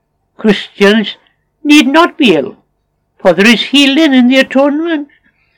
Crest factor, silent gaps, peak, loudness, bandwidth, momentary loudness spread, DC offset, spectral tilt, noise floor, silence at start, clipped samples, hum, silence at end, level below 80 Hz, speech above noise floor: 10 dB; none; 0 dBFS; -9 LUFS; 18.5 kHz; 10 LU; under 0.1%; -4.5 dB/octave; -62 dBFS; 0.4 s; 1%; 50 Hz at -55 dBFS; 0.55 s; -52 dBFS; 54 dB